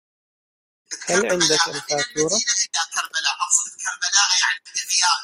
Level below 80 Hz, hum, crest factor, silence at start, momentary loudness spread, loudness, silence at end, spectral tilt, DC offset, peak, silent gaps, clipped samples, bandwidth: -64 dBFS; none; 20 dB; 0.9 s; 7 LU; -19 LUFS; 0 s; 0 dB/octave; under 0.1%; -2 dBFS; none; under 0.1%; 16 kHz